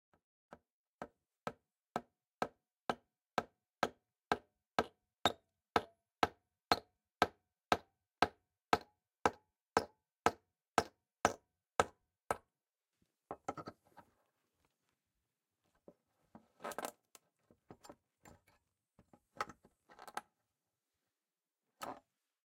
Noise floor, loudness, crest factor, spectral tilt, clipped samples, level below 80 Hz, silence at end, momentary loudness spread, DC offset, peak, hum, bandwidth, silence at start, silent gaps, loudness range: under -90 dBFS; -41 LUFS; 34 dB; -3.5 dB/octave; under 0.1%; -72 dBFS; 0.5 s; 17 LU; under 0.1%; -10 dBFS; none; 16 kHz; 1 s; 2.34-2.38 s, 2.81-2.86 s, 10.68-10.72 s; 15 LU